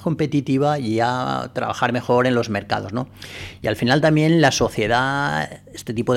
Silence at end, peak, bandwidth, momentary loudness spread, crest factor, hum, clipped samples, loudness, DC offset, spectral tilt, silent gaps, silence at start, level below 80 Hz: 0 s; -6 dBFS; 15.5 kHz; 13 LU; 14 dB; none; under 0.1%; -20 LUFS; under 0.1%; -5.5 dB/octave; none; 0 s; -48 dBFS